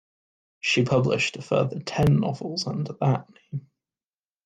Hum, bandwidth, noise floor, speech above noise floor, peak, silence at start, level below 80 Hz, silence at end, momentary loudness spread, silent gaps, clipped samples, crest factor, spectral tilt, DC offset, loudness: none; 9.4 kHz; under -90 dBFS; over 66 dB; -10 dBFS; 0.65 s; -54 dBFS; 0.85 s; 14 LU; none; under 0.1%; 16 dB; -6 dB/octave; under 0.1%; -24 LUFS